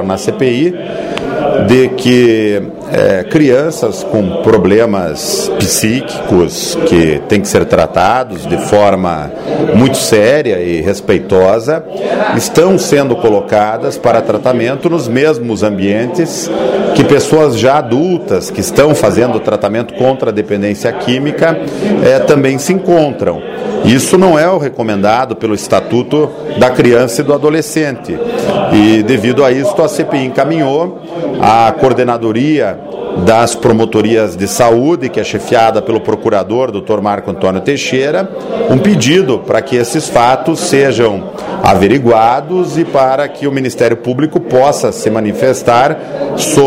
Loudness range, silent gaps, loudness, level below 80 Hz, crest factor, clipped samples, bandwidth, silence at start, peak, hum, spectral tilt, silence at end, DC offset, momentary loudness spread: 2 LU; none; -11 LUFS; -42 dBFS; 10 dB; 0.5%; 16.5 kHz; 0 s; 0 dBFS; none; -5 dB/octave; 0 s; under 0.1%; 7 LU